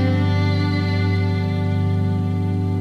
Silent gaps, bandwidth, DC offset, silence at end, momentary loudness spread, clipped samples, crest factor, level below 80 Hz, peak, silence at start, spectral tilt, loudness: none; 6.2 kHz; under 0.1%; 0 s; 3 LU; under 0.1%; 10 dB; -56 dBFS; -8 dBFS; 0 s; -8.5 dB/octave; -20 LUFS